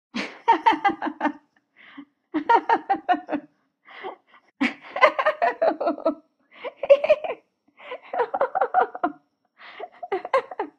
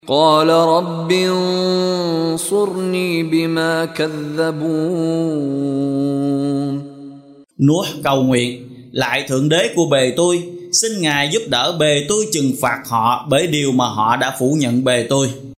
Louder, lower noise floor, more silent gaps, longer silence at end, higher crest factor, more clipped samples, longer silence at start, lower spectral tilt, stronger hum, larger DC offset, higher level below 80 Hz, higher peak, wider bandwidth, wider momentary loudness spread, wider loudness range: second, -23 LUFS vs -17 LUFS; first, -56 dBFS vs -40 dBFS; neither; about the same, 0.1 s vs 0.05 s; first, 24 dB vs 16 dB; neither; about the same, 0.15 s vs 0.05 s; about the same, -4.5 dB/octave vs -4.5 dB/octave; neither; neither; second, -72 dBFS vs -56 dBFS; about the same, -2 dBFS vs 0 dBFS; second, 8.6 kHz vs 16 kHz; first, 19 LU vs 5 LU; about the same, 4 LU vs 3 LU